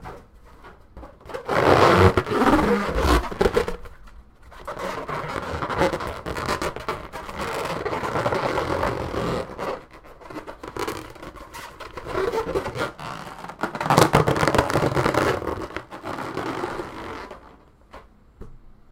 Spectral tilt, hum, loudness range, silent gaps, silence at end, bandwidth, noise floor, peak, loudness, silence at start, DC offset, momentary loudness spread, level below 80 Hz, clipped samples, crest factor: -5.5 dB/octave; none; 11 LU; none; 0.25 s; 17 kHz; -50 dBFS; 0 dBFS; -23 LUFS; 0 s; under 0.1%; 19 LU; -38 dBFS; under 0.1%; 24 dB